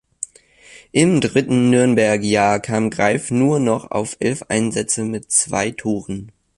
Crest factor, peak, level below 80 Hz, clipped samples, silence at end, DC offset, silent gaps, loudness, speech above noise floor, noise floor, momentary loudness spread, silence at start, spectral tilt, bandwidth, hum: 16 dB; -2 dBFS; -52 dBFS; under 0.1%; 0.3 s; under 0.1%; none; -18 LUFS; 30 dB; -47 dBFS; 10 LU; 0.2 s; -4.5 dB/octave; 11.5 kHz; none